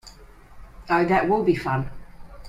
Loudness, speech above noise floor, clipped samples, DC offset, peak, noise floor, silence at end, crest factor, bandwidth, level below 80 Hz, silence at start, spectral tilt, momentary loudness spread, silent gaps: -22 LUFS; 25 dB; under 0.1%; under 0.1%; -6 dBFS; -46 dBFS; 0 s; 18 dB; 13.5 kHz; -44 dBFS; 0.05 s; -7.5 dB/octave; 8 LU; none